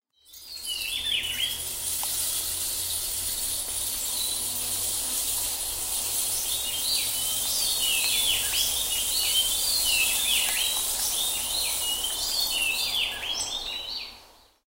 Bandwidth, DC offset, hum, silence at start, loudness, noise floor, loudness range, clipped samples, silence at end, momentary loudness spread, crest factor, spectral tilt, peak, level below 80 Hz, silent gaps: 16 kHz; under 0.1%; none; 0.3 s; -24 LUFS; -53 dBFS; 4 LU; under 0.1%; 0.4 s; 7 LU; 18 dB; 1.5 dB/octave; -10 dBFS; -50 dBFS; none